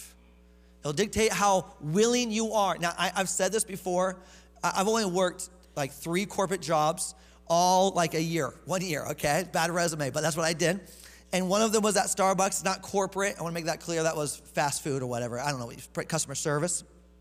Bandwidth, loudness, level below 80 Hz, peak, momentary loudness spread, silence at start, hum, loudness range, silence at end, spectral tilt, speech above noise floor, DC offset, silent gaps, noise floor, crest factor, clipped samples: 16 kHz; -28 LUFS; -56 dBFS; -10 dBFS; 8 LU; 0 s; none; 3 LU; 0.35 s; -3.5 dB/octave; 28 dB; under 0.1%; none; -56 dBFS; 18 dB; under 0.1%